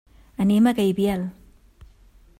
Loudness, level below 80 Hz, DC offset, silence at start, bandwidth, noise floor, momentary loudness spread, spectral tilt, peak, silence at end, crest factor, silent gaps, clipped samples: -21 LUFS; -50 dBFS; under 0.1%; 0.4 s; 16 kHz; -52 dBFS; 15 LU; -7 dB/octave; -8 dBFS; 1.1 s; 16 dB; none; under 0.1%